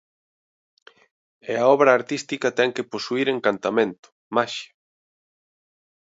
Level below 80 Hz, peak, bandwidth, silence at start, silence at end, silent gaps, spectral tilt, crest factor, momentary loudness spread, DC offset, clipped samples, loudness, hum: -74 dBFS; -2 dBFS; 8 kHz; 1.45 s; 1.45 s; 3.99-4.03 s, 4.12-4.31 s; -4.5 dB/octave; 22 dB; 12 LU; under 0.1%; under 0.1%; -22 LUFS; none